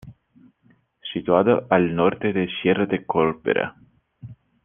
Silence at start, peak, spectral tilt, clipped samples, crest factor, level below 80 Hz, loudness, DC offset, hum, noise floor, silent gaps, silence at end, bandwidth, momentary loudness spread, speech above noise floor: 0.05 s; -2 dBFS; -9.5 dB/octave; under 0.1%; 20 dB; -58 dBFS; -21 LUFS; under 0.1%; none; -60 dBFS; none; 0.3 s; 3.7 kHz; 11 LU; 40 dB